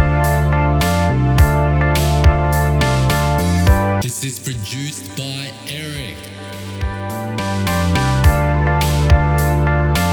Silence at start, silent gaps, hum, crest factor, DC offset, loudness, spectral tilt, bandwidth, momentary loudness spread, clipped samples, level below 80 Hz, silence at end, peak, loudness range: 0 s; none; none; 14 dB; under 0.1%; -16 LUFS; -5.5 dB/octave; 19 kHz; 12 LU; under 0.1%; -20 dBFS; 0 s; 0 dBFS; 9 LU